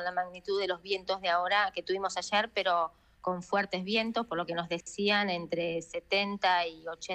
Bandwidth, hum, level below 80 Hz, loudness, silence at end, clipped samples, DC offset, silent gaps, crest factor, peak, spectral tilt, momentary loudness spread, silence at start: 10 kHz; none; -66 dBFS; -31 LUFS; 0 s; under 0.1%; under 0.1%; none; 16 dB; -14 dBFS; -3.5 dB/octave; 8 LU; 0 s